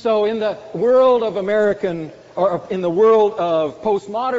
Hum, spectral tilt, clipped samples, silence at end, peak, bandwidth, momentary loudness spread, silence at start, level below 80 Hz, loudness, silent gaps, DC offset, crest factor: none; -4.5 dB/octave; under 0.1%; 0 s; -4 dBFS; 7.8 kHz; 10 LU; 0 s; -58 dBFS; -17 LUFS; none; under 0.1%; 12 dB